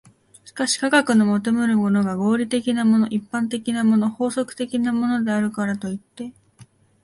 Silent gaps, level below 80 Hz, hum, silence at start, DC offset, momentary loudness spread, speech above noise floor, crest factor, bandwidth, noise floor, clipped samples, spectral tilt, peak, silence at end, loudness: none; -62 dBFS; none; 0.45 s; under 0.1%; 10 LU; 31 dB; 18 dB; 11.5 kHz; -51 dBFS; under 0.1%; -5 dB/octave; -2 dBFS; 0.4 s; -21 LUFS